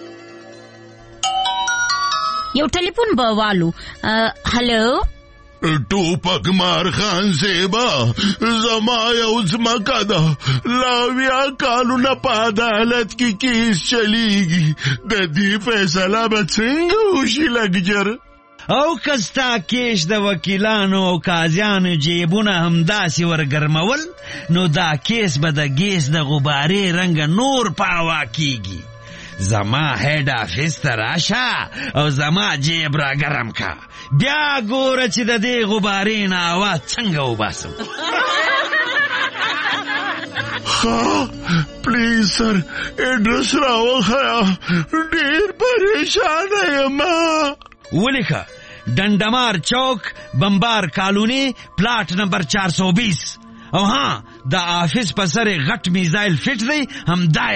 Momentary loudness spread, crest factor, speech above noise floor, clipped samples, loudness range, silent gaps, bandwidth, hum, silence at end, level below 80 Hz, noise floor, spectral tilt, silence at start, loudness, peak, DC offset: 6 LU; 14 dB; 26 dB; under 0.1%; 2 LU; none; 8.8 kHz; none; 0 s; -42 dBFS; -43 dBFS; -4.5 dB/octave; 0 s; -17 LUFS; -4 dBFS; 0.3%